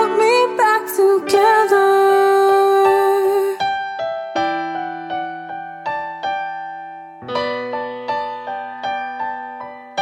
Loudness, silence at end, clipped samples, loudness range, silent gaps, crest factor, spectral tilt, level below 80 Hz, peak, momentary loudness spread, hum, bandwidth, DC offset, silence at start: -17 LUFS; 0 s; under 0.1%; 11 LU; none; 16 dB; -3.5 dB/octave; -64 dBFS; -2 dBFS; 15 LU; none; 17 kHz; under 0.1%; 0 s